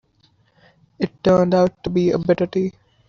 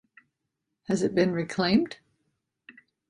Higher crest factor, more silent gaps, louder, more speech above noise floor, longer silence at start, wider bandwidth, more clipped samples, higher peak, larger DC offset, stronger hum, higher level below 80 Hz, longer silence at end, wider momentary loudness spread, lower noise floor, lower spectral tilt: about the same, 16 dB vs 20 dB; neither; first, -19 LUFS vs -26 LUFS; second, 42 dB vs 58 dB; about the same, 1 s vs 0.9 s; second, 7 kHz vs 11.5 kHz; neither; first, -4 dBFS vs -10 dBFS; neither; neither; first, -50 dBFS vs -64 dBFS; about the same, 0.4 s vs 0.4 s; second, 12 LU vs 18 LU; second, -60 dBFS vs -83 dBFS; about the same, -7 dB/octave vs -6 dB/octave